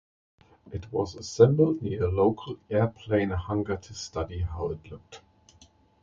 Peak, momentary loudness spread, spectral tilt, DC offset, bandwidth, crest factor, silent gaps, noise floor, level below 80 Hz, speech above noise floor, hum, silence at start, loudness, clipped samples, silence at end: -6 dBFS; 17 LU; -7 dB/octave; under 0.1%; 7.6 kHz; 22 dB; none; -59 dBFS; -44 dBFS; 32 dB; none; 0.65 s; -27 LUFS; under 0.1%; 0.85 s